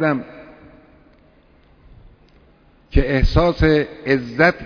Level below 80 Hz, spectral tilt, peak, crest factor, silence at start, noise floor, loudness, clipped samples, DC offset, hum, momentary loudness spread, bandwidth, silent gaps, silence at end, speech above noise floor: -26 dBFS; -8 dB/octave; 0 dBFS; 20 dB; 0 s; -52 dBFS; -18 LUFS; under 0.1%; under 0.1%; none; 11 LU; 5.4 kHz; none; 0 s; 36 dB